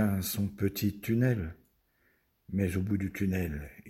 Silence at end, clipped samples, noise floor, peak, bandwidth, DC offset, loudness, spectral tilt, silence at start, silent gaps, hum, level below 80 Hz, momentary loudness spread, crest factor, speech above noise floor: 0 s; under 0.1%; -71 dBFS; -16 dBFS; 16.5 kHz; under 0.1%; -32 LUFS; -6.5 dB/octave; 0 s; none; none; -50 dBFS; 7 LU; 16 dB; 40 dB